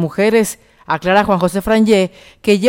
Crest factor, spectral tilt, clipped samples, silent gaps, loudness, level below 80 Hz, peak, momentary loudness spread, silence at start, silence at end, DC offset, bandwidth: 12 dB; -5.5 dB/octave; under 0.1%; none; -15 LUFS; -42 dBFS; -2 dBFS; 10 LU; 0 s; 0 s; under 0.1%; 17 kHz